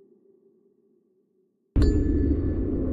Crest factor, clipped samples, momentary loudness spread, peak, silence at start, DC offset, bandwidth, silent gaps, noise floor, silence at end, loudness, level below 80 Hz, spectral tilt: 16 dB; under 0.1%; 5 LU; -10 dBFS; 1.75 s; under 0.1%; 7.6 kHz; none; -69 dBFS; 0 s; -25 LUFS; -30 dBFS; -9.5 dB/octave